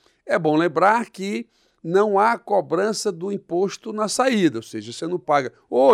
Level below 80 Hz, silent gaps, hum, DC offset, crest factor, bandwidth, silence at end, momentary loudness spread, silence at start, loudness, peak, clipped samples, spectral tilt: -72 dBFS; none; none; under 0.1%; 16 dB; 15 kHz; 0 s; 11 LU; 0.25 s; -21 LUFS; -4 dBFS; under 0.1%; -5 dB/octave